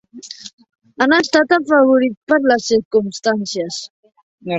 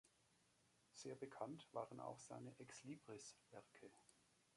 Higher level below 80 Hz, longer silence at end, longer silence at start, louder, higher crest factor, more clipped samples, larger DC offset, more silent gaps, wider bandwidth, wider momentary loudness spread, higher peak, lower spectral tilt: first, -60 dBFS vs under -90 dBFS; second, 0 s vs 0.15 s; about the same, 0.15 s vs 0.05 s; first, -15 LUFS vs -57 LUFS; second, 16 dB vs 22 dB; neither; neither; first, 0.53-0.58 s, 2.17-2.27 s, 2.85-2.91 s, 3.90-4.03 s, 4.23-4.38 s vs none; second, 8.2 kHz vs 11.5 kHz; first, 21 LU vs 13 LU; first, 0 dBFS vs -36 dBFS; about the same, -4 dB/octave vs -4.5 dB/octave